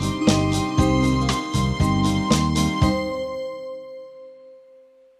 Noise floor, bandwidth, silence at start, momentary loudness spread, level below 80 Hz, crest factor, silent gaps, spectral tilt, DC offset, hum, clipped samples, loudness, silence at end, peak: -51 dBFS; 14.5 kHz; 0 s; 16 LU; -34 dBFS; 20 dB; none; -5.5 dB/octave; under 0.1%; none; under 0.1%; -21 LUFS; 0.65 s; -2 dBFS